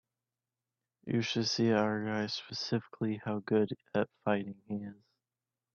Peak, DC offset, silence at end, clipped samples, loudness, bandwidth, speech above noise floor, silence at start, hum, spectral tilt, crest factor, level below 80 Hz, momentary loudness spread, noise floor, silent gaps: -14 dBFS; under 0.1%; 0.8 s; under 0.1%; -34 LUFS; 7 kHz; over 57 dB; 1.05 s; none; -5.5 dB/octave; 20 dB; -74 dBFS; 12 LU; under -90 dBFS; none